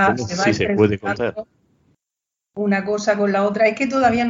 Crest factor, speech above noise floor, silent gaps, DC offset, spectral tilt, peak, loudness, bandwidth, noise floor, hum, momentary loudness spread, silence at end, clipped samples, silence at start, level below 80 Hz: 18 dB; 67 dB; none; under 0.1%; -5.5 dB/octave; -2 dBFS; -19 LUFS; 7.6 kHz; -85 dBFS; none; 8 LU; 0 s; under 0.1%; 0 s; -50 dBFS